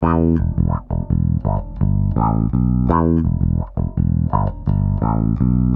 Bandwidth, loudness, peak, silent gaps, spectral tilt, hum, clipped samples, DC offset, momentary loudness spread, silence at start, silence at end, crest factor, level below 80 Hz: 3.1 kHz; -19 LUFS; 0 dBFS; none; -13.5 dB/octave; none; under 0.1%; under 0.1%; 5 LU; 0 s; 0 s; 16 dB; -24 dBFS